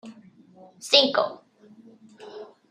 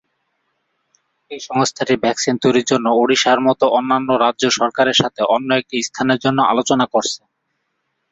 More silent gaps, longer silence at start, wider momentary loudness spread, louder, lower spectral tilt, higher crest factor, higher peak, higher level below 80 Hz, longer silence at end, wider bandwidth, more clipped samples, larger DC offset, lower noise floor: neither; second, 0.05 s vs 1.3 s; first, 26 LU vs 5 LU; second, -20 LUFS vs -16 LUFS; second, -1.5 dB/octave vs -3.5 dB/octave; first, 26 dB vs 16 dB; about the same, -2 dBFS vs -2 dBFS; second, -80 dBFS vs -58 dBFS; second, 0.25 s vs 0.95 s; first, 13.5 kHz vs 8 kHz; neither; neither; second, -52 dBFS vs -71 dBFS